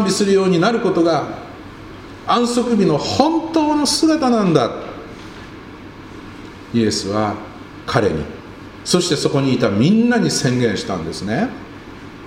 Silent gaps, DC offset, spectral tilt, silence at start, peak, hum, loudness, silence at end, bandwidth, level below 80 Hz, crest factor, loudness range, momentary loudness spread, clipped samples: none; under 0.1%; -5 dB/octave; 0 s; 0 dBFS; none; -17 LUFS; 0 s; 16 kHz; -46 dBFS; 18 dB; 6 LU; 21 LU; under 0.1%